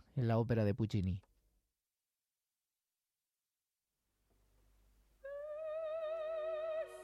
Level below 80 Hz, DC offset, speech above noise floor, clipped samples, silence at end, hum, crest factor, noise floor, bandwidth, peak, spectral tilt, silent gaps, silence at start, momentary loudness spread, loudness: -68 dBFS; under 0.1%; over 55 dB; under 0.1%; 0 s; none; 18 dB; under -90 dBFS; 11 kHz; -24 dBFS; -8.5 dB/octave; none; 0.15 s; 13 LU; -39 LUFS